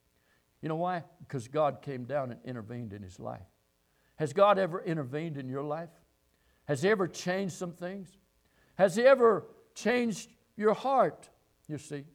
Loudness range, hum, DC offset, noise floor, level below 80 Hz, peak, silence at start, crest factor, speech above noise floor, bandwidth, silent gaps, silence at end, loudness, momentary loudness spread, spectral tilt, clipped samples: 8 LU; none; under 0.1%; -72 dBFS; -72 dBFS; -12 dBFS; 0.65 s; 20 dB; 42 dB; 15 kHz; none; 0.1 s; -30 LUFS; 19 LU; -5.5 dB/octave; under 0.1%